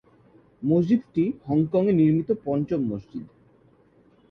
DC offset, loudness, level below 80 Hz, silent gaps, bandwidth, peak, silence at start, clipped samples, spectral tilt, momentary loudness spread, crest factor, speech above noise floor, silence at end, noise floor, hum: under 0.1%; -24 LUFS; -58 dBFS; none; 6 kHz; -10 dBFS; 0.6 s; under 0.1%; -11 dB/octave; 12 LU; 14 dB; 36 dB; 1.05 s; -58 dBFS; none